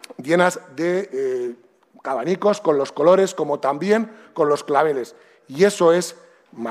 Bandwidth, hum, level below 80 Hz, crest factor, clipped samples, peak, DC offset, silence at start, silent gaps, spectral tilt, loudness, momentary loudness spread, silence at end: 15 kHz; none; -70 dBFS; 18 dB; under 0.1%; -2 dBFS; under 0.1%; 0.2 s; none; -5 dB/octave; -20 LUFS; 14 LU; 0 s